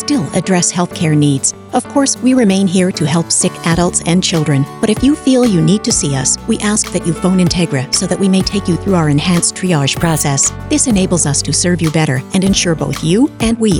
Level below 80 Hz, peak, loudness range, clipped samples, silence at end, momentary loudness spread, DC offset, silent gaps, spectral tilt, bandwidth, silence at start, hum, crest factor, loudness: -34 dBFS; 0 dBFS; 1 LU; under 0.1%; 0 s; 4 LU; under 0.1%; none; -4.5 dB/octave; 19 kHz; 0 s; none; 12 dB; -13 LUFS